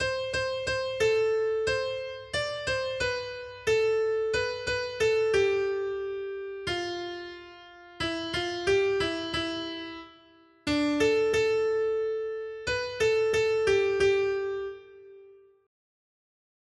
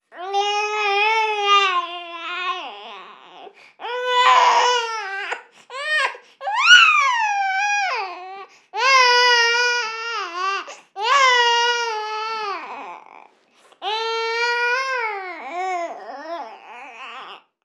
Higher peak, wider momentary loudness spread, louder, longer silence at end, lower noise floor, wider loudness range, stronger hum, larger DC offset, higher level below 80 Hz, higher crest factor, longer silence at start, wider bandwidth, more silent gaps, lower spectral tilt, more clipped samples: second, -14 dBFS vs 0 dBFS; second, 11 LU vs 22 LU; second, -28 LUFS vs -18 LUFS; first, 1.3 s vs 0.25 s; about the same, -58 dBFS vs -55 dBFS; second, 4 LU vs 8 LU; neither; neither; first, -54 dBFS vs under -90 dBFS; about the same, 16 dB vs 20 dB; second, 0 s vs 0.15 s; about the same, 11.5 kHz vs 12.5 kHz; neither; first, -4 dB/octave vs 2.5 dB/octave; neither